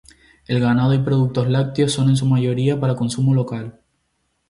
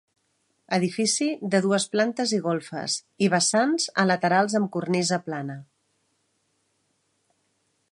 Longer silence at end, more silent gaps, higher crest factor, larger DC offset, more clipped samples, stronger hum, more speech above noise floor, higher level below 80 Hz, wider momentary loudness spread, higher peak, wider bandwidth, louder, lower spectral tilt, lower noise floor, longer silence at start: second, 0.8 s vs 2.3 s; neither; second, 14 dB vs 20 dB; neither; neither; neither; first, 52 dB vs 48 dB; first, -50 dBFS vs -76 dBFS; about the same, 6 LU vs 8 LU; about the same, -6 dBFS vs -6 dBFS; about the same, 11.5 kHz vs 11.5 kHz; first, -18 LUFS vs -24 LUFS; first, -7 dB/octave vs -4 dB/octave; about the same, -69 dBFS vs -72 dBFS; second, 0.5 s vs 0.7 s